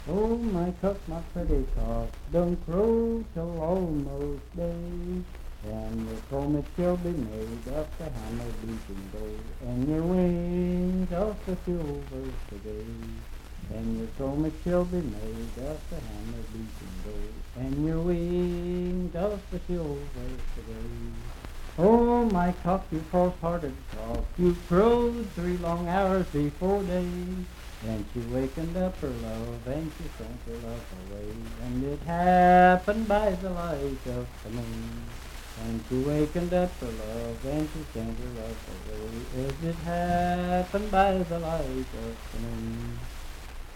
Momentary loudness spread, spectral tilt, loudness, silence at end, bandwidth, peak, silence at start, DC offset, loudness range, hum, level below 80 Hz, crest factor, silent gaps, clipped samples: 15 LU; -7.5 dB/octave; -29 LUFS; 0 s; 16.5 kHz; -8 dBFS; 0 s; under 0.1%; 9 LU; none; -38 dBFS; 22 dB; none; under 0.1%